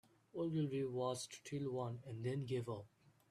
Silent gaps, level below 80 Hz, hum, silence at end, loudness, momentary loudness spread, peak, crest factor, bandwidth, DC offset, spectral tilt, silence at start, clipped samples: none; -78 dBFS; none; 0.45 s; -44 LUFS; 7 LU; -28 dBFS; 16 dB; 13.5 kHz; under 0.1%; -6.5 dB/octave; 0.35 s; under 0.1%